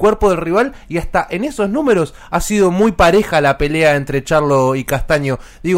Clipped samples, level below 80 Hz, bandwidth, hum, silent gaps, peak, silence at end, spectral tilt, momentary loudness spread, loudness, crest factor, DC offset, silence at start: under 0.1%; -30 dBFS; 16 kHz; none; none; -2 dBFS; 0 s; -5.5 dB/octave; 8 LU; -15 LUFS; 12 dB; under 0.1%; 0 s